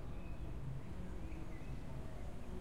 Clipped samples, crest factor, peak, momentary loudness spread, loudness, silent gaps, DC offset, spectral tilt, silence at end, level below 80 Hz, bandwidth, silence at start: under 0.1%; 12 dB; -34 dBFS; 2 LU; -49 LUFS; none; 0.4%; -7.5 dB/octave; 0 s; -50 dBFS; 15.5 kHz; 0 s